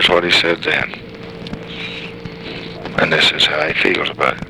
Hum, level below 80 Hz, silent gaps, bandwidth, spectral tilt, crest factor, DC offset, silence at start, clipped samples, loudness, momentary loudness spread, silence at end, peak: none; -44 dBFS; none; 18 kHz; -3.5 dB/octave; 18 dB; 0.2%; 0 s; under 0.1%; -15 LUFS; 18 LU; 0 s; 0 dBFS